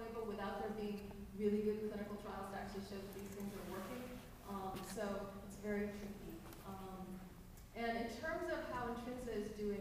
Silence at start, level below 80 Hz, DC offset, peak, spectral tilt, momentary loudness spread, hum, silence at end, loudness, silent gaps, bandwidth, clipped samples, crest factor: 0 s; -60 dBFS; under 0.1%; -26 dBFS; -5.5 dB/octave; 10 LU; none; 0 s; -46 LUFS; none; 15.5 kHz; under 0.1%; 18 dB